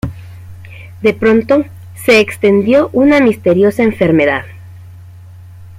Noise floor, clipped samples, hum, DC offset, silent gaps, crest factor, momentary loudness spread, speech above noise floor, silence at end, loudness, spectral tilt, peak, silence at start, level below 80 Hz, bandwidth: -34 dBFS; under 0.1%; none; under 0.1%; none; 12 dB; 17 LU; 24 dB; 0.05 s; -11 LUFS; -6.5 dB/octave; 0 dBFS; 0.05 s; -44 dBFS; 16 kHz